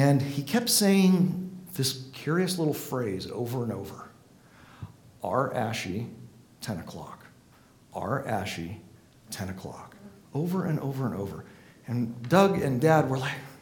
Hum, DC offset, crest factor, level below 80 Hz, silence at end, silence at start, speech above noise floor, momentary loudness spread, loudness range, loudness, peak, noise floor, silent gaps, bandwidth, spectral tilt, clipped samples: none; under 0.1%; 22 dB; -62 dBFS; 0.05 s; 0 s; 30 dB; 21 LU; 10 LU; -28 LUFS; -6 dBFS; -57 dBFS; none; 19 kHz; -5.5 dB/octave; under 0.1%